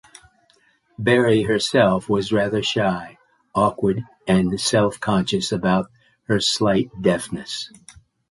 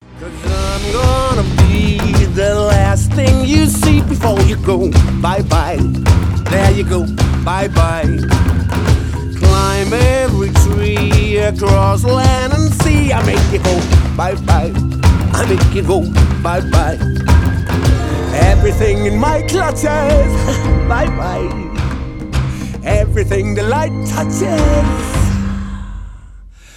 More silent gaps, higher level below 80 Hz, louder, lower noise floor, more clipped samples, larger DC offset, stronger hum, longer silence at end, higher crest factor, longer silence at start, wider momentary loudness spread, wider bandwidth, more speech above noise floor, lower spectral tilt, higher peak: neither; second, -50 dBFS vs -18 dBFS; second, -20 LUFS vs -13 LUFS; first, -60 dBFS vs -36 dBFS; neither; neither; neither; first, 0.65 s vs 0.25 s; first, 18 dB vs 12 dB; first, 1 s vs 0.1 s; first, 11 LU vs 7 LU; second, 11.5 kHz vs 15.5 kHz; first, 40 dB vs 24 dB; about the same, -5 dB/octave vs -6 dB/octave; second, -4 dBFS vs 0 dBFS